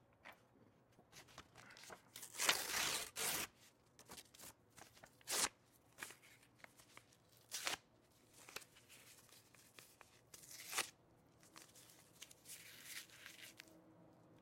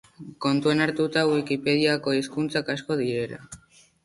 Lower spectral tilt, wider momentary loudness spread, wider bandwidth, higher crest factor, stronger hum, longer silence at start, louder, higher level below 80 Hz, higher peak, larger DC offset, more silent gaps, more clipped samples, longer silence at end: second, 0 dB/octave vs -5.5 dB/octave; first, 24 LU vs 11 LU; first, 16.5 kHz vs 11.5 kHz; first, 32 dB vs 18 dB; neither; about the same, 0.25 s vs 0.2 s; second, -44 LUFS vs -25 LUFS; second, -82 dBFS vs -62 dBFS; second, -18 dBFS vs -8 dBFS; neither; neither; neither; second, 0 s vs 0.5 s